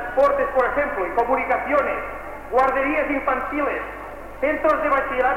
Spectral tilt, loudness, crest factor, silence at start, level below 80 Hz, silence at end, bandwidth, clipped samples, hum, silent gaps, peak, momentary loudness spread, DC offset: -6 dB/octave; -21 LUFS; 14 dB; 0 s; -42 dBFS; 0 s; 16 kHz; under 0.1%; none; none; -8 dBFS; 10 LU; under 0.1%